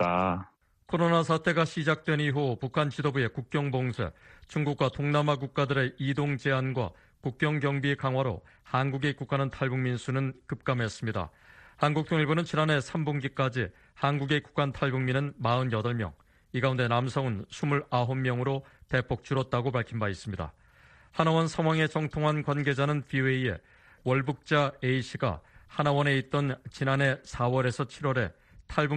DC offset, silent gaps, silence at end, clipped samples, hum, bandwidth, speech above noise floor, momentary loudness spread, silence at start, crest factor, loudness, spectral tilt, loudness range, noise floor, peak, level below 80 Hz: under 0.1%; none; 0 s; under 0.1%; none; 9.4 kHz; 29 dB; 8 LU; 0 s; 22 dB; -29 LUFS; -6.5 dB/octave; 2 LU; -58 dBFS; -8 dBFS; -56 dBFS